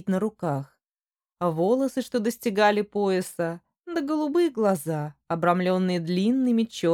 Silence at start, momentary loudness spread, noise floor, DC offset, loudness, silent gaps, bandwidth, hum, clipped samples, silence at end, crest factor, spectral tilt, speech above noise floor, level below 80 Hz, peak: 0.05 s; 9 LU; under -90 dBFS; under 0.1%; -25 LUFS; 1.03-1.07 s; 18 kHz; none; under 0.1%; 0 s; 16 dB; -6.5 dB/octave; over 66 dB; -68 dBFS; -8 dBFS